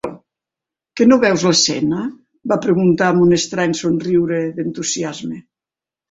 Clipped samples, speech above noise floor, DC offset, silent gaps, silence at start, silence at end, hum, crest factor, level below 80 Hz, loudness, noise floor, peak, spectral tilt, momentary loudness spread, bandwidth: under 0.1%; 73 dB; under 0.1%; none; 0.05 s; 0.7 s; none; 16 dB; -54 dBFS; -16 LUFS; -89 dBFS; 0 dBFS; -4.5 dB/octave; 16 LU; 8 kHz